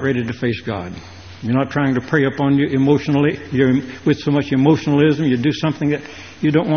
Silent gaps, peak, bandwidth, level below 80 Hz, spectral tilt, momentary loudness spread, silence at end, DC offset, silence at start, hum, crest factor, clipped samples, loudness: none; 0 dBFS; 6.6 kHz; -50 dBFS; -6.5 dB/octave; 11 LU; 0 s; 0.2%; 0 s; none; 16 dB; under 0.1%; -18 LUFS